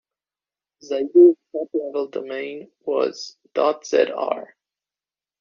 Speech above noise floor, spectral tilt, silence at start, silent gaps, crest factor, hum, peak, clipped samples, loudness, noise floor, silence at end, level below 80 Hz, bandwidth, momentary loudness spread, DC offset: over 70 dB; -3 dB/octave; 0.85 s; none; 18 dB; 50 Hz at -70 dBFS; -4 dBFS; under 0.1%; -21 LUFS; under -90 dBFS; 0.95 s; -74 dBFS; 7.2 kHz; 16 LU; under 0.1%